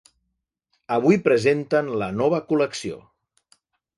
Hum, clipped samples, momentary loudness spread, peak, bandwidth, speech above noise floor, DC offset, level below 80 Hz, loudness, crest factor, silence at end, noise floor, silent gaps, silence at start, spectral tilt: none; under 0.1%; 12 LU; -2 dBFS; 11.5 kHz; 57 dB; under 0.1%; -60 dBFS; -21 LUFS; 20 dB; 1 s; -78 dBFS; none; 0.9 s; -6 dB/octave